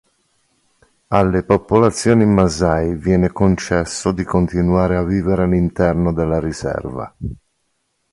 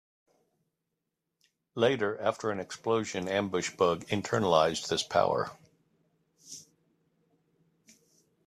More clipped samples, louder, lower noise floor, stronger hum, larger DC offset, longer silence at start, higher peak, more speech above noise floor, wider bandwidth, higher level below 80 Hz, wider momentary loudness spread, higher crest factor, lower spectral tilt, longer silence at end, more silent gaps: neither; first, -17 LUFS vs -29 LUFS; second, -68 dBFS vs -85 dBFS; neither; neither; second, 1.1 s vs 1.75 s; first, 0 dBFS vs -8 dBFS; second, 52 dB vs 56 dB; second, 11.5 kHz vs 14 kHz; first, -32 dBFS vs -70 dBFS; second, 10 LU vs 16 LU; second, 16 dB vs 24 dB; first, -7 dB/octave vs -4.5 dB/octave; second, 0.8 s vs 1.85 s; neither